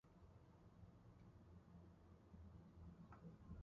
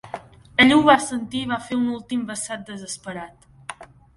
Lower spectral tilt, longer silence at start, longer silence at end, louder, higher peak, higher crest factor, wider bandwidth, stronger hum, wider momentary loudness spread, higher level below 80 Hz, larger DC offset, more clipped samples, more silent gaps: first, -8.5 dB/octave vs -3.5 dB/octave; about the same, 0.05 s vs 0.05 s; second, 0 s vs 0.3 s; second, -65 LUFS vs -20 LUFS; second, -48 dBFS vs 0 dBFS; second, 16 dB vs 22 dB; second, 7 kHz vs 11.5 kHz; neither; second, 6 LU vs 23 LU; second, -70 dBFS vs -54 dBFS; neither; neither; neither